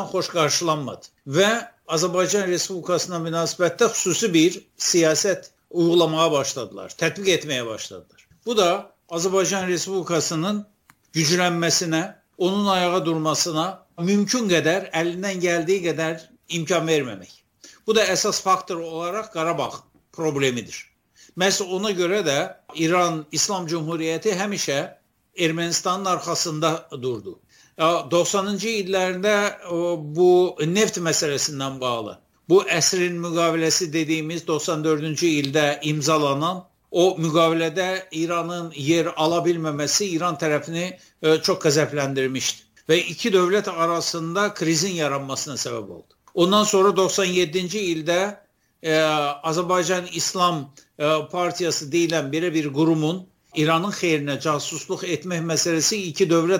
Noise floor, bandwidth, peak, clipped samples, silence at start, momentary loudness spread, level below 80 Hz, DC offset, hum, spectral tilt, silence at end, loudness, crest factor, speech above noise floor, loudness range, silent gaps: -49 dBFS; 17 kHz; -4 dBFS; under 0.1%; 0 s; 9 LU; -66 dBFS; under 0.1%; none; -3.5 dB/octave; 0 s; -22 LUFS; 18 dB; 27 dB; 3 LU; none